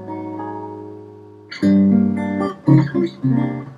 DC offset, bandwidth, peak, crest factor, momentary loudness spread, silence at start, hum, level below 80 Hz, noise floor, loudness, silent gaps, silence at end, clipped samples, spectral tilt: under 0.1%; 7.4 kHz; -2 dBFS; 18 dB; 20 LU; 0 s; none; -62 dBFS; -40 dBFS; -18 LUFS; none; 0 s; under 0.1%; -9.5 dB/octave